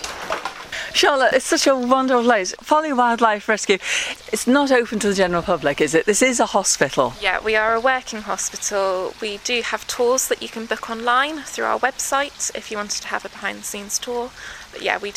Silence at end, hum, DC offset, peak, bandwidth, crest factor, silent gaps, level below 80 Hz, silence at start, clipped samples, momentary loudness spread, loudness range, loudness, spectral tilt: 0 s; none; under 0.1%; 0 dBFS; 16 kHz; 20 dB; none; -50 dBFS; 0 s; under 0.1%; 10 LU; 5 LU; -20 LUFS; -2 dB/octave